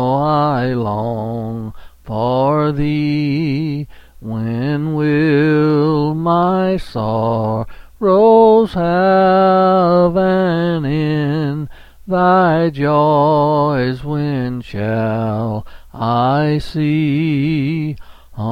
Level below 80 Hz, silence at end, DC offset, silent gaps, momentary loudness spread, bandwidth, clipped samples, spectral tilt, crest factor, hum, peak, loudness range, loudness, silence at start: -40 dBFS; 0 s; under 0.1%; none; 12 LU; 6 kHz; under 0.1%; -9 dB/octave; 14 dB; none; 0 dBFS; 6 LU; -15 LUFS; 0 s